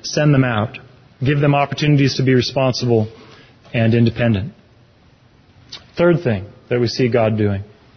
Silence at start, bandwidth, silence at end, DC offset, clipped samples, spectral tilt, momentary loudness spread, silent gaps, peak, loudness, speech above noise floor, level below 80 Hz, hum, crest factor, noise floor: 0.05 s; 6.6 kHz; 0.3 s; under 0.1%; under 0.1%; -6.5 dB/octave; 12 LU; none; -4 dBFS; -17 LUFS; 35 dB; -44 dBFS; none; 14 dB; -51 dBFS